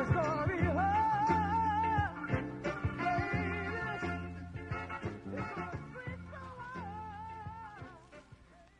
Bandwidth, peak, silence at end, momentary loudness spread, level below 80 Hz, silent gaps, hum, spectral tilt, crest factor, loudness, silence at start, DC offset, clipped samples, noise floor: 10 kHz; -18 dBFS; 0.15 s; 16 LU; -54 dBFS; none; none; -7.5 dB/octave; 18 dB; -35 LUFS; 0 s; under 0.1%; under 0.1%; -58 dBFS